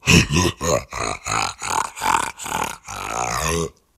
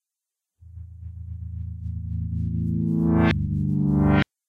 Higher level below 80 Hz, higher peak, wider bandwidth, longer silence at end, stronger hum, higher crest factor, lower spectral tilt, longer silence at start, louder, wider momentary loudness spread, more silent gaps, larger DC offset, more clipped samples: about the same, -36 dBFS vs -36 dBFS; first, 0 dBFS vs -8 dBFS; first, 16 kHz vs 6.2 kHz; about the same, 0.25 s vs 0.25 s; neither; first, 22 dB vs 16 dB; second, -3.5 dB/octave vs -9.5 dB/octave; second, 0.05 s vs 0.65 s; first, -21 LUFS vs -24 LUFS; second, 8 LU vs 20 LU; neither; neither; neither